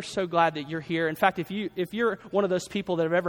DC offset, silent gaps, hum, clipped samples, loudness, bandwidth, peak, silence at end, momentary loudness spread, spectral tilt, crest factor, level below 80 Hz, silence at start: under 0.1%; none; none; under 0.1%; -27 LUFS; over 20 kHz; -6 dBFS; 0 s; 7 LU; -5.5 dB/octave; 20 dB; -64 dBFS; 0 s